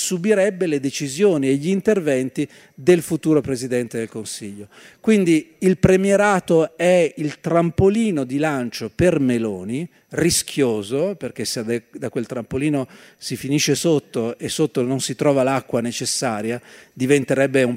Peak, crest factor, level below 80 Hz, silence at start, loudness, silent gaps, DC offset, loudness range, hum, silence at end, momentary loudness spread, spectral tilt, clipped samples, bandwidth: -2 dBFS; 18 dB; -46 dBFS; 0 s; -20 LUFS; none; under 0.1%; 5 LU; none; 0 s; 11 LU; -5 dB/octave; under 0.1%; 16 kHz